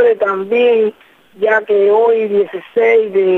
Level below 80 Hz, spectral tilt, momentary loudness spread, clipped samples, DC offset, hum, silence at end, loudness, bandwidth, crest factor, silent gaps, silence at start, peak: -64 dBFS; -6.5 dB/octave; 6 LU; under 0.1%; under 0.1%; none; 0 s; -13 LUFS; 4 kHz; 10 dB; none; 0 s; -2 dBFS